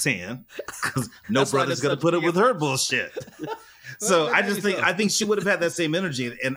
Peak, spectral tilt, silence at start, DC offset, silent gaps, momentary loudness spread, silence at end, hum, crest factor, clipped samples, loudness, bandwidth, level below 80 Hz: -4 dBFS; -3.5 dB/octave; 0 s; under 0.1%; none; 15 LU; 0 s; none; 20 dB; under 0.1%; -23 LUFS; 16.5 kHz; -64 dBFS